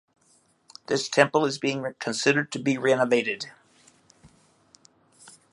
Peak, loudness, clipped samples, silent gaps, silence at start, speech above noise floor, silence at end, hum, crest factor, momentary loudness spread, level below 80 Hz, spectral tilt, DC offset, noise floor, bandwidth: -2 dBFS; -24 LUFS; under 0.1%; none; 0.9 s; 40 dB; 0.25 s; none; 26 dB; 10 LU; -74 dBFS; -4 dB/octave; under 0.1%; -64 dBFS; 11.5 kHz